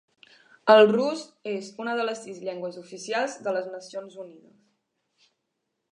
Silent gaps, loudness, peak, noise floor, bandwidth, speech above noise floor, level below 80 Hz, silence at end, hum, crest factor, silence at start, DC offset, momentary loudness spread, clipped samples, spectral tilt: none; -25 LUFS; -2 dBFS; -80 dBFS; 10.5 kHz; 55 dB; -84 dBFS; 1.6 s; none; 24 dB; 0.65 s; under 0.1%; 22 LU; under 0.1%; -4.5 dB/octave